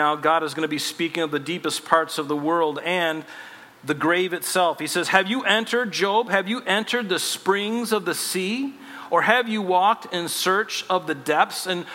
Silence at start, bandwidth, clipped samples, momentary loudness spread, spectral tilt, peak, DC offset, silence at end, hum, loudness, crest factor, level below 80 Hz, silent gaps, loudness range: 0 s; 16.5 kHz; under 0.1%; 7 LU; -3 dB/octave; 0 dBFS; under 0.1%; 0 s; none; -22 LUFS; 22 dB; -76 dBFS; none; 2 LU